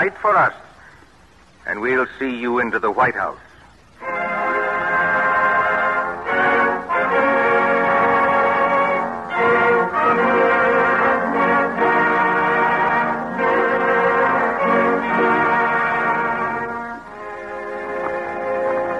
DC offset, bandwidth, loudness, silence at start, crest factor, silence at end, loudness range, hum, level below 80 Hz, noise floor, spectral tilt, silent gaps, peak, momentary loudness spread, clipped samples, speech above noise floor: 0.1%; 10.5 kHz; -18 LUFS; 0 s; 12 dB; 0 s; 5 LU; none; -54 dBFS; -50 dBFS; -6.5 dB/octave; none; -6 dBFS; 9 LU; under 0.1%; 30 dB